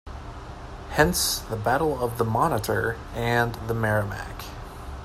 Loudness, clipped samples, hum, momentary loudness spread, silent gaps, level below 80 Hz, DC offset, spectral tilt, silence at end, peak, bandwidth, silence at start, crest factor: -25 LUFS; under 0.1%; none; 17 LU; none; -40 dBFS; under 0.1%; -4.5 dB/octave; 0 s; -4 dBFS; 16 kHz; 0.05 s; 22 dB